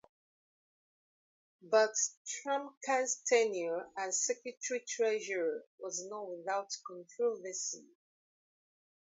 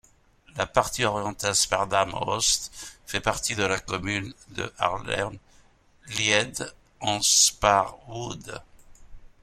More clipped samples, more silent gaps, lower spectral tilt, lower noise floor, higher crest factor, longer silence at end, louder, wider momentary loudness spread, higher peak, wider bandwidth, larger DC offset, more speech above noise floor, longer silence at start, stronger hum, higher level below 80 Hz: neither; first, 2.17-2.25 s, 2.77-2.81 s, 5.67-5.78 s vs none; about the same, -0.5 dB/octave vs -1.5 dB/octave; first, under -90 dBFS vs -58 dBFS; about the same, 20 dB vs 22 dB; first, 1.25 s vs 0.15 s; second, -35 LUFS vs -24 LUFS; second, 12 LU vs 17 LU; second, -16 dBFS vs -4 dBFS; second, 7.6 kHz vs 16.5 kHz; neither; first, over 55 dB vs 32 dB; first, 1.65 s vs 0.55 s; neither; second, under -90 dBFS vs -50 dBFS